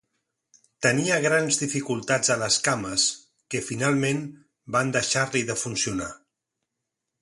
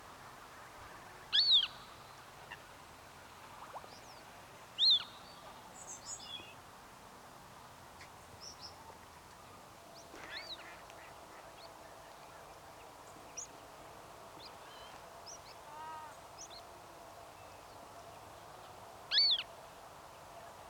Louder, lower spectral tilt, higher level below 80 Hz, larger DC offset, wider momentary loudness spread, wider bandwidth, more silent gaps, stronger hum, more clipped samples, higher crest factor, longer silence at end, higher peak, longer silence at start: first, -24 LUFS vs -33 LUFS; first, -3 dB/octave vs -0.5 dB/octave; first, -60 dBFS vs -72 dBFS; neither; second, 10 LU vs 24 LU; second, 11.5 kHz vs 19 kHz; neither; neither; neither; about the same, 20 dB vs 24 dB; first, 1.05 s vs 0 s; first, -6 dBFS vs -20 dBFS; first, 0.8 s vs 0 s